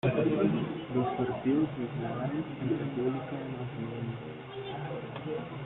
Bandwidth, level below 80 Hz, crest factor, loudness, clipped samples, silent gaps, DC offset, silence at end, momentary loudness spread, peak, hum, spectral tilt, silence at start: 4.1 kHz; -62 dBFS; 18 dB; -33 LUFS; under 0.1%; none; under 0.1%; 0 s; 10 LU; -16 dBFS; none; -10.5 dB/octave; 0.05 s